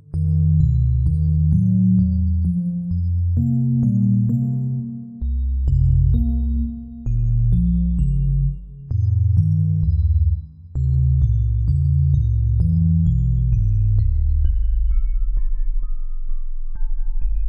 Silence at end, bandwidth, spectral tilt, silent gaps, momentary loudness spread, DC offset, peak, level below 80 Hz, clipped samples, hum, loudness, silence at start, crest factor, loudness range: 0 s; 1.3 kHz; -12.5 dB/octave; none; 12 LU; under 0.1%; -6 dBFS; -22 dBFS; under 0.1%; none; -20 LUFS; 0.1 s; 12 dB; 3 LU